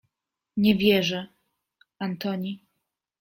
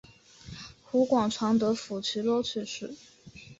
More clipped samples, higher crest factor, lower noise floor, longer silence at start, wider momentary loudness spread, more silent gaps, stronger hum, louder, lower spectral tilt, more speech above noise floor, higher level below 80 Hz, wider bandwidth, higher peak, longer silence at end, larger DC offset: neither; about the same, 22 dB vs 18 dB; first, -85 dBFS vs -51 dBFS; about the same, 0.55 s vs 0.45 s; second, 16 LU vs 19 LU; neither; neither; first, -25 LUFS vs -28 LUFS; about the same, -6 dB/octave vs -5 dB/octave; first, 61 dB vs 23 dB; about the same, -62 dBFS vs -62 dBFS; first, 16.5 kHz vs 8 kHz; first, -6 dBFS vs -12 dBFS; first, 0.65 s vs 0.05 s; neither